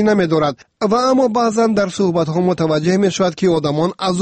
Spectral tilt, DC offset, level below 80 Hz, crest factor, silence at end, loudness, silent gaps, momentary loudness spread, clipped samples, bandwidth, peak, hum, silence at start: -6 dB/octave; under 0.1%; -52 dBFS; 12 dB; 0 s; -16 LUFS; none; 4 LU; under 0.1%; 8.8 kHz; -4 dBFS; none; 0 s